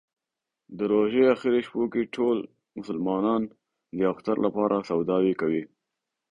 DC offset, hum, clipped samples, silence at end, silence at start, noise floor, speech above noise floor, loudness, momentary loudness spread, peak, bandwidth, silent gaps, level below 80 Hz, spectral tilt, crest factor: under 0.1%; none; under 0.1%; 0.65 s; 0.7 s; -87 dBFS; 62 dB; -26 LUFS; 15 LU; -10 dBFS; 7.6 kHz; none; -64 dBFS; -8 dB/octave; 18 dB